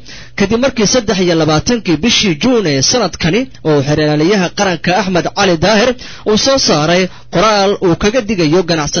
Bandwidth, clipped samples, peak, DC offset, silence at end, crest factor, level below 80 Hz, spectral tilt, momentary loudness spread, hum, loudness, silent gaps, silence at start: 6.8 kHz; under 0.1%; 0 dBFS; 0.9%; 0 s; 12 dB; -36 dBFS; -4 dB/octave; 5 LU; none; -12 LUFS; none; 0 s